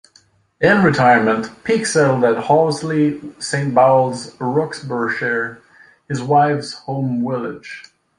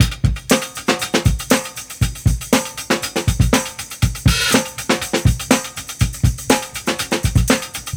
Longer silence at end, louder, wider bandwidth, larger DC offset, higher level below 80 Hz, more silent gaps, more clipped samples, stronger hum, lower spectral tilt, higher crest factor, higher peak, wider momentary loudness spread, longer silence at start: first, 0.35 s vs 0 s; about the same, -17 LUFS vs -18 LUFS; second, 11.5 kHz vs over 20 kHz; neither; second, -56 dBFS vs -26 dBFS; neither; neither; neither; first, -5.5 dB/octave vs -4 dB/octave; about the same, 16 dB vs 18 dB; about the same, -2 dBFS vs 0 dBFS; first, 13 LU vs 6 LU; first, 0.6 s vs 0 s